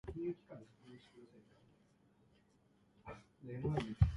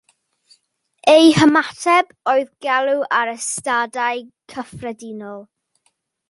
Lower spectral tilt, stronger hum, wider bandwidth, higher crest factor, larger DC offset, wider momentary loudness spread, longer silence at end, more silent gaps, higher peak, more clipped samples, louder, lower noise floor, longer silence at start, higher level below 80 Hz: first, -8.5 dB/octave vs -4 dB/octave; neither; about the same, 11 kHz vs 11.5 kHz; first, 26 dB vs 18 dB; neither; about the same, 22 LU vs 21 LU; second, 0 s vs 0.85 s; neither; second, -16 dBFS vs -2 dBFS; neither; second, -43 LUFS vs -16 LUFS; first, -72 dBFS vs -67 dBFS; second, 0.05 s vs 1.05 s; first, -50 dBFS vs -58 dBFS